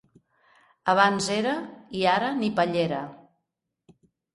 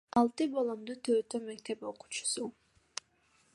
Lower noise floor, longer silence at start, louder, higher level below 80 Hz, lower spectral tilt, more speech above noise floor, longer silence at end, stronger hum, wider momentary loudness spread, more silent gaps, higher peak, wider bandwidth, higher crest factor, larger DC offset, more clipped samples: first, -82 dBFS vs -70 dBFS; first, 0.85 s vs 0.15 s; first, -25 LUFS vs -35 LUFS; first, -66 dBFS vs -74 dBFS; first, -4.5 dB/octave vs -3 dB/octave; first, 58 dB vs 37 dB; first, 1.2 s vs 1.05 s; neither; second, 12 LU vs 15 LU; neither; first, -6 dBFS vs -14 dBFS; about the same, 11.5 kHz vs 11.5 kHz; about the same, 22 dB vs 22 dB; neither; neither